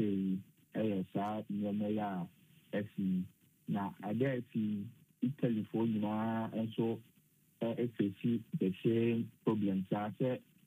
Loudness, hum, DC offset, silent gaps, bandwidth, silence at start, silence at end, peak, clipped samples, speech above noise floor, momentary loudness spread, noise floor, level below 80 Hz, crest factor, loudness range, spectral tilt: -37 LUFS; none; under 0.1%; none; 15.5 kHz; 0 s; 0.25 s; -18 dBFS; under 0.1%; 34 dB; 7 LU; -70 dBFS; -80 dBFS; 18 dB; 3 LU; -9 dB/octave